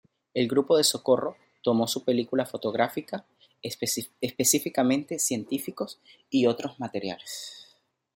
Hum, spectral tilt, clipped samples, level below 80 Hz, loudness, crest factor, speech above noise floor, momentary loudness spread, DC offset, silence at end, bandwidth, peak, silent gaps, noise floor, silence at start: none; -3.5 dB/octave; under 0.1%; -72 dBFS; -27 LUFS; 20 dB; 37 dB; 14 LU; under 0.1%; 0.5 s; 16.5 kHz; -8 dBFS; none; -64 dBFS; 0.35 s